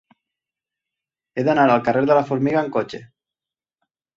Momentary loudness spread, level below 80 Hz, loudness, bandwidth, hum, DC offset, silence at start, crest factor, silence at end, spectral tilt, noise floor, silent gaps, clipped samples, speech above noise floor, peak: 16 LU; -64 dBFS; -19 LUFS; 7.6 kHz; none; under 0.1%; 1.35 s; 20 dB; 1.1 s; -7.5 dB/octave; under -90 dBFS; none; under 0.1%; over 72 dB; -2 dBFS